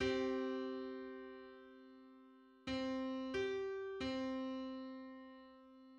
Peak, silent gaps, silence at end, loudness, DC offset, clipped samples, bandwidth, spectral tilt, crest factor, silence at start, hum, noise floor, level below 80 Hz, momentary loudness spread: -26 dBFS; none; 0 s; -44 LUFS; under 0.1%; under 0.1%; 8.6 kHz; -5 dB/octave; 18 dB; 0 s; none; -64 dBFS; -68 dBFS; 20 LU